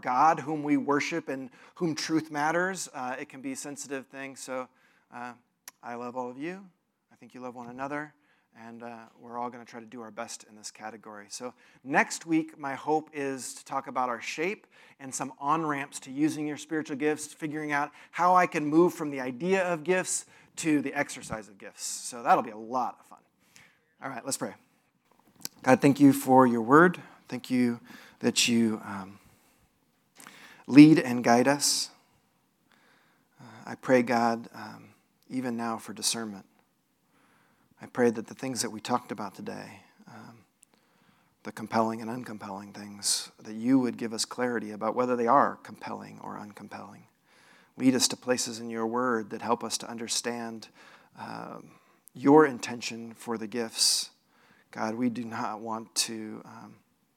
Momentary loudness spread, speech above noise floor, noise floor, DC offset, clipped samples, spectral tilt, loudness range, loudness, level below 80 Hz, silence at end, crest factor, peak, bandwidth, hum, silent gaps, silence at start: 21 LU; 43 dB; -72 dBFS; under 0.1%; under 0.1%; -4 dB/octave; 15 LU; -28 LUFS; -78 dBFS; 0.45 s; 26 dB; -2 dBFS; 16 kHz; none; none; 0.05 s